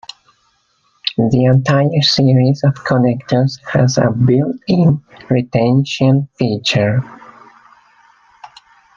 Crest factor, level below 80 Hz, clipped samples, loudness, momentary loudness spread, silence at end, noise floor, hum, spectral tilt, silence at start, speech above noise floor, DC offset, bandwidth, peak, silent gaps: 14 dB; -48 dBFS; under 0.1%; -14 LUFS; 7 LU; 0.5 s; -60 dBFS; none; -6.5 dB/octave; 1.05 s; 46 dB; under 0.1%; 7.4 kHz; 0 dBFS; none